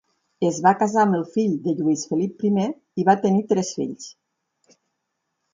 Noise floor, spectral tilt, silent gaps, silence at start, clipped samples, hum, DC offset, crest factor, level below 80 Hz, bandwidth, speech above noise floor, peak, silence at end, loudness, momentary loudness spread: -77 dBFS; -6 dB/octave; none; 0.4 s; under 0.1%; none; under 0.1%; 20 dB; -68 dBFS; 7.6 kHz; 57 dB; -4 dBFS; 1.4 s; -22 LUFS; 9 LU